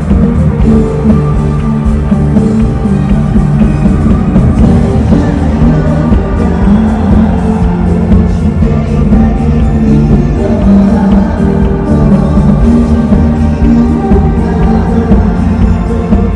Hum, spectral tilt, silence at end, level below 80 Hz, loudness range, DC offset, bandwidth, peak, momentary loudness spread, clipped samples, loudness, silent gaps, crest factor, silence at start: none; -9.5 dB/octave; 0 s; -14 dBFS; 1 LU; under 0.1%; 10 kHz; 0 dBFS; 3 LU; 5%; -8 LUFS; none; 6 dB; 0 s